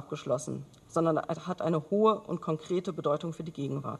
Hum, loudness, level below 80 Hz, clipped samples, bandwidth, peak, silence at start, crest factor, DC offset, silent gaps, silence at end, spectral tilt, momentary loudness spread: none; -31 LUFS; -68 dBFS; under 0.1%; 12 kHz; -12 dBFS; 0 s; 18 dB; under 0.1%; none; 0 s; -7 dB/octave; 10 LU